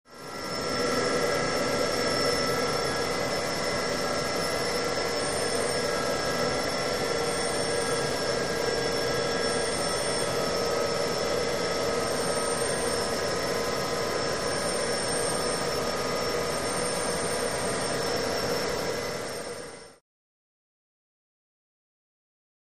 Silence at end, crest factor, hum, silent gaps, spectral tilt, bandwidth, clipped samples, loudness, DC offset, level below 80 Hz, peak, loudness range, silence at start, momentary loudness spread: 2.75 s; 16 dB; none; none; -3 dB/octave; 15.5 kHz; under 0.1%; -27 LUFS; 0.7%; -52 dBFS; -14 dBFS; 4 LU; 0.05 s; 2 LU